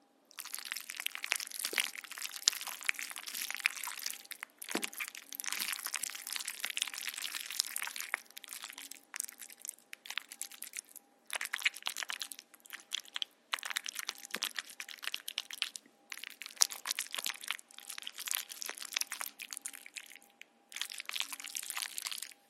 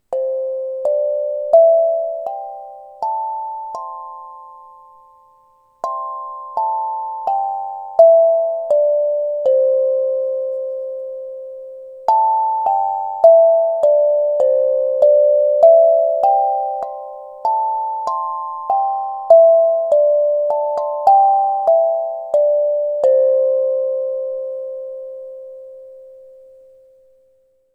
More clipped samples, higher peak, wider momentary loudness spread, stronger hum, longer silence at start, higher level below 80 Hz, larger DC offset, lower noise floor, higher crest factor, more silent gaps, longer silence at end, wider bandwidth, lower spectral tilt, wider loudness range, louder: neither; about the same, 0 dBFS vs 0 dBFS; second, 12 LU vs 18 LU; neither; first, 0.35 s vs 0.1 s; second, under -90 dBFS vs -70 dBFS; neither; first, -61 dBFS vs -57 dBFS; first, 40 dB vs 16 dB; neither; second, 0.15 s vs 1.6 s; first, 16 kHz vs 5.2 kHz; second, 2.5 dB/octave vs -4.5 dB/octave; second, 5 LU vs 14 LU; second, -38 LUFS vs -16 LUFS